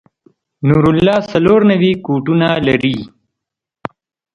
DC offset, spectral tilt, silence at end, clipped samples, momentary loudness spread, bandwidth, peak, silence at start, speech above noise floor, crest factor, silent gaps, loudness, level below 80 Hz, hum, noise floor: under 0.1%; -8 dB/octave; 1.25 s; under 0.1%; 20 LU; 7.8 kHz; 0 dBFS; 0.6 s; 70 dB; 14 dB; none; -13 LUFS; -42 dBFS; none; -82 dBFS